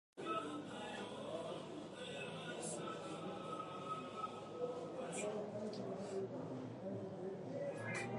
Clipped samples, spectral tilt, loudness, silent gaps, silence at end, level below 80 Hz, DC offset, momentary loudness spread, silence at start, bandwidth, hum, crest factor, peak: under 0.1%; -4.5 dB/octave; -46 LUFS; none; 0 s; -80 dBFS; under 0.1%; 4 LU; 0.15 s; 11.5 kHz; none; 16 dB; -30 dBFS